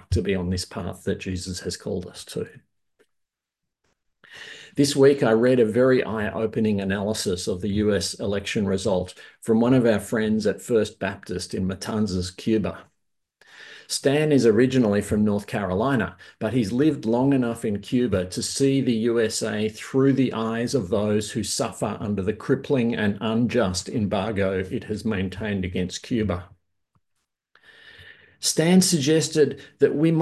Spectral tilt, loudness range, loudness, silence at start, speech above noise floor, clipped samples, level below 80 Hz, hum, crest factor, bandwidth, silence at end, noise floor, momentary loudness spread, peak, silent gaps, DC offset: -5.5 dB/octave; 8 LU; -23 LUFS; 0.1 s; 61 dB; under 0.1%; -46 dBFS; none; 18 dB; 12.5 kHz; 0 s; -84 dBFS; 12 LU; -6 dBFS; none; under 0.1%